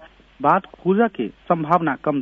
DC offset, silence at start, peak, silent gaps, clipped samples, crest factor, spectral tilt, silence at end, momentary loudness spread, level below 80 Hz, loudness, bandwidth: under 0.1%; 0 s; -2 dBFS; none; under 0.1%; 18 dB; -9.5 dB/octave; 0 s; 4 LU; -56 dBFS; -20 LUFS; 6.2 kHz